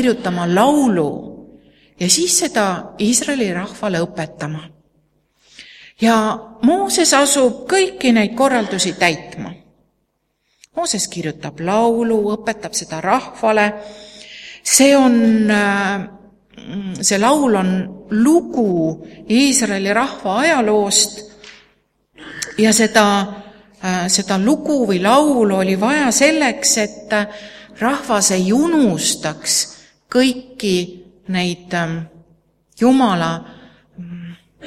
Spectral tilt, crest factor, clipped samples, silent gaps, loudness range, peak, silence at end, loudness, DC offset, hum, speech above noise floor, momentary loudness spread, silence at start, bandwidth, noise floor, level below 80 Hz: -3.5 dB/octave; 18 dB; under 0.1%; none; 5 LU; 0 dBFS; 0 s; -16 LUFS; under 0.1%; none; 52 dB; 16 LU; 0 s; 16 kHz; -68 dBFS; -54 dBFS